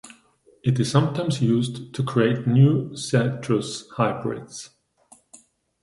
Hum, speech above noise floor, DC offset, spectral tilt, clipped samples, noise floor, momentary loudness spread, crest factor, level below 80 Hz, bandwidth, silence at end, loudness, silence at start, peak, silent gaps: none; 36 dB; under 0.1%; -6.5 dB/octave; under 0.1%; -58 dBFS; 13 LU; 18 dB; -60 dBFS; 11.5 kHz; 1.15 s; -23 LUFS; 0.05 s; -6 dBFS; none